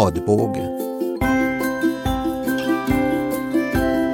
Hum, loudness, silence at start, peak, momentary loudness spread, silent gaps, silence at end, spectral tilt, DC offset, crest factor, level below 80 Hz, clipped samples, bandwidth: none; -21 LUFS; 0 s; -2 dBFS; 4 LU; none; 0 s; -6.5 dB/octave; under 0.1%; 18 dB; -36 dBFS; under 0.1%; 17 kHz